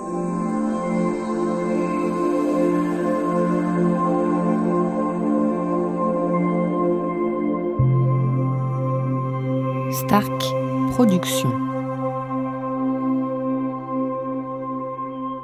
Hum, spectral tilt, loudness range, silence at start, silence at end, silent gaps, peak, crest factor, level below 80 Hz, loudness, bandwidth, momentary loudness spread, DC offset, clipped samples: none; -7 dB/octave; 3 LU; 0 s; 0 s; none; -4 dBFS; 18 dB; -50 dBFS; -22 LUFS; 16 kHz; 6 LU; under 0.1%; under 0.1%